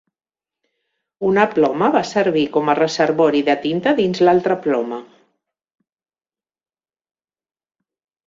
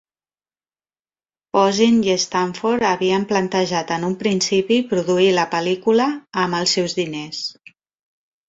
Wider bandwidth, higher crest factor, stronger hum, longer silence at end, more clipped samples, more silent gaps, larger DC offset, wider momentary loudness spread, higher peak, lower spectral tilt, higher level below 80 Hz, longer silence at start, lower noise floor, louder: about the same, 7.6 kHz vs 7.8 kHz; about the same, 18 dB vs 16 dB; neither; first, 3.2 s vs 0.95 s; neither; neither; neither; about the same, 6 LU vs 7 LU; about the same, -2 dBFS vs -4 dBFS; first, -5.5 dB/octave vs -4 dB/octave; about the same, -62 dBFS vs -60 dBFS; second, 1.2 s vs 1.55 s; about the same, under -90 dBFS vs under -90 dBFS; about the same, -17 LUFS vs -19 LUFS